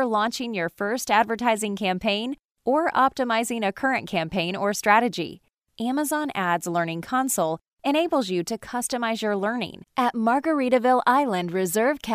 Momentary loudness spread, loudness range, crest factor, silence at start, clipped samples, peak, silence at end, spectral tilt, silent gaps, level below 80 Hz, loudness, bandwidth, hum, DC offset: 8 LU; 2 LU; 20 dB; 0 s; under 0.1%; -4 dBFS; 0 s; -4 dB/octave; 2.45-2.49 s; -62 dBFS; -24 LUFS; 15.5 kHz; none; under 0.1%